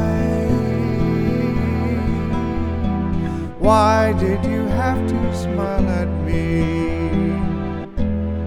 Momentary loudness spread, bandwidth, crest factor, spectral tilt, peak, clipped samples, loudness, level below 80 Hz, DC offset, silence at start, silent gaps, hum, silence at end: 6 LU; 12.5 kHz; 16 dB; -8 dB/octave; -2 dBFS; under 0.1%; -20 LUFS; -30 dBFS; under 0.1%; 0 s; none; none; 0 s